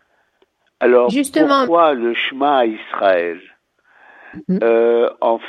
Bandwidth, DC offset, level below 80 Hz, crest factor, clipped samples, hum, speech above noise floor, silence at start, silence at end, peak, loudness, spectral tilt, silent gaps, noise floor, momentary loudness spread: 12.5 kHz; under 0.1%; -66 dBFS; 16 dB; under 0.1%; none; 46 dB; 0.8 s; 0 s; 0 dBFS; -15 LUFS; -5 dB/octave; none; -61 dBFS; 8 LU